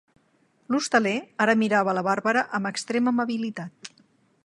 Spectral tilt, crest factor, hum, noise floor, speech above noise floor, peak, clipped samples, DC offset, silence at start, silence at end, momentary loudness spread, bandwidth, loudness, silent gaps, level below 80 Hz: -4.5 dB/octave; 20 dB; none; -65 dBFS; 41 dB; -6 dBFS; under 0.1%; under 0.1%; 0.7 s; 0.6 s; 14 LU; 11.5 kHz; -24 LUFS; none; -74 dBFS